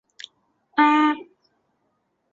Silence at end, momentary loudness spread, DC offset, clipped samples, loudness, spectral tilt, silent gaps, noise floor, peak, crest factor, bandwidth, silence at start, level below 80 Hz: 1.1 s; 25 LU; under 0.1%; under 0.1%; -20 LUFS; -3 dB/octave; none; -72 dBFS; -6 dBFS; 18 dB; 7.6 kHz; 0.75 s; -74 dBFS